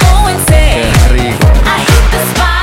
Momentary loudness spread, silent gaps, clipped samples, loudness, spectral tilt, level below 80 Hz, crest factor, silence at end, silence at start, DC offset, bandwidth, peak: 2 LU; none; 0.2%; -9 LUFS; -4.5 dB/octave; -10 dBFS; 6 dB; 0 s; 0 s; under 0.1%; 16.5 kHz; 0 dBFS